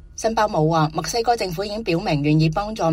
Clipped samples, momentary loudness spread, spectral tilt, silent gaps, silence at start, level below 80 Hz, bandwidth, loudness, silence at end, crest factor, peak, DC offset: under 0.1%; 5 LU; -5.5 dB/octave; none; 0.05 s; -42 dBFS; 16 kHz; -21 LUFS; 0 s; 14 dB; -6 dBFS; under 0.1%